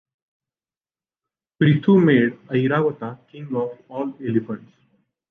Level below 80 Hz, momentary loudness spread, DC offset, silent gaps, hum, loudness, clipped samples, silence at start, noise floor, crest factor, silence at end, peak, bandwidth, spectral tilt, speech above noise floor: -66 dBFS; 19 LU; under 0.1%; none; none; -20 LUFS; under 0.1%; 1.6 s; under -90 dBFS; 18 dB; 0.75 s; -4 dBFS; 4.2 kHz; -10 dB/octave; over 70 dB